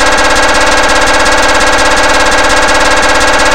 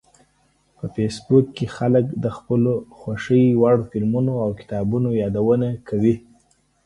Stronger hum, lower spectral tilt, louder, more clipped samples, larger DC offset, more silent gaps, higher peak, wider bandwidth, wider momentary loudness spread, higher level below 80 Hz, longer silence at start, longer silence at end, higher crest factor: neither; second, -1.5 dB/octave vs -8.5 dB/octave; first, -6 LUFS vs -20 LUFS; first, 2% vs under 0.1%; first, 20% vs under 0.1%; neither; first, 0 dBFS vs -4 dBFS; first, over 20 kHz vs 11 kHz; second, 0 LU vs 10 LU; first, -22 dBFS vs -50 dBFS; second, 0 s vs 0.85 s; second, 0 s vs 0.65 s; second, 8 dB vs 18 dB